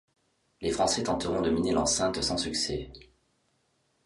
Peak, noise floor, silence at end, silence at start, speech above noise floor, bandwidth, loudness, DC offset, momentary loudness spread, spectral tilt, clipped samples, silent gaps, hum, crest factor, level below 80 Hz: -12 dBFS; -72 dBFS; 1.05 s; 0.6 s; 44 dB; 11.5 kHz; -28 LUFS; under 0.1%; 9 LU; -3.5 dB/octave; under 0.1%; none; none; 18 dB; -50 dBFS